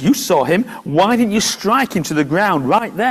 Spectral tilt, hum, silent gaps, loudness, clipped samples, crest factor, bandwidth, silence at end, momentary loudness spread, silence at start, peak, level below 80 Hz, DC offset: -4.5 dB/octave; none; none; -15 LUFS; under 0.1%; 14 dB; 16 kHz; 0 s; 4 LU; 0 s; -2 dBFS; -52 dBFS; under 0.1%